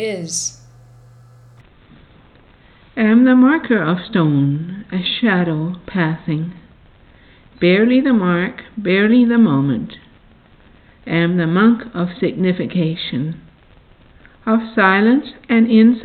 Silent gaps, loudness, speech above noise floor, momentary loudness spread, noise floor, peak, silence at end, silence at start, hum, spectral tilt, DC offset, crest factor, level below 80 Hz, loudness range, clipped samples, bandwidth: none; -16 LUFS; 33 dB; 12 LU; -48 dBFS; -2 dBFS; 0 s; 0 s; none; -6 dB/octave; under 0.1%; 16 dB; -52 dBFS; 4 LU; under 0.1%; 10.5 kHz